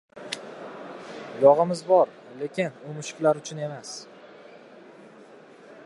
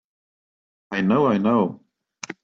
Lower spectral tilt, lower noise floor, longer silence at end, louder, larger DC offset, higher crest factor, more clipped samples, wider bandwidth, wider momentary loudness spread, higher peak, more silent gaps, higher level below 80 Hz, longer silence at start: second, -5 dB/octave vs -7 dB/octave; first, -49 dBFS vs -39 dBFS; first, 1.8 s vs 0.1 s; second, -25 LUFS vs -21 LUFS; neither; first, 22 dB vs 16 dB; neither; first, 11.5 kHz vs 7.6 kHz; first, 21 LU vs 16 LU; first, -4 dBFS vs -8 dBFS; neither; second, -80 dBFS vs -64 dBFS; second, 0.15 s vs 0.9 s